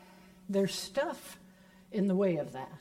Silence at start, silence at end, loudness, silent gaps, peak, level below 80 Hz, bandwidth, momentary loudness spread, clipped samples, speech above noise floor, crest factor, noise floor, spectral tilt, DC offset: 0.45 s; 0 s; -33 LUFS; none; -18 dBFS; -70 dBFS; 16 kHz; 20 LU; under 0.1%; 26 dB; 16 dB; -58 dBFS; -5.5 dB/octave; under 0.1%